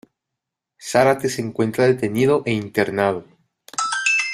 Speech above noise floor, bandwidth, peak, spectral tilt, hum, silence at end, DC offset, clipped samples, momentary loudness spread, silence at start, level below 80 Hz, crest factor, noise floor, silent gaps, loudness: 64 dB; 15 kHz; -2 dBFS; -4.5 dB/octave; none; 0 s; under 0.1%; under 0.1%; 8 LU; 0.8 s; -58 dBFS; 20 dB; -83 dBFS; none; -20 LUFS